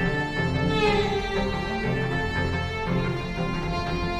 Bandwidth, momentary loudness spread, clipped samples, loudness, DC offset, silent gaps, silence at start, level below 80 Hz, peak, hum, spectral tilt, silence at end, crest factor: 12 kHz; 6 LU; under 0.1%; -26 LUFS; under 0.1%; none; 0 s; -36 dBFS; -10 dBFS; none; -6.5 dB/octave; 0 s; 16 dB